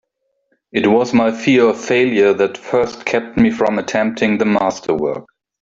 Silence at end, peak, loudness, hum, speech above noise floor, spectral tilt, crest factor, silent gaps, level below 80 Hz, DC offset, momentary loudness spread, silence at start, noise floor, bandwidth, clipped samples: 0.4 s; -2 dBFS; -16 LUFS; none; 51 dB; -5.5 dB/octave; 14 dB; none; -50 dBFS; under 0.1%; 6 LU; 0.75 s; -66 dBFS; 7.8 kHz; under 0.1%